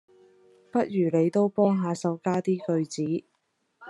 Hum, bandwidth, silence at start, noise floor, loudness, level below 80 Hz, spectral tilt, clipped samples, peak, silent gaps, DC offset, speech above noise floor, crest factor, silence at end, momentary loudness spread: none; 11 kHz; 0.75 s; -74 dBFS; -26 LUFS; -76 dBFS; -7.5 dB/octave; under 0.1%; -10 dBFS; none; under 0.1%; 49 dB; 18 dB; 0 s; 7 LU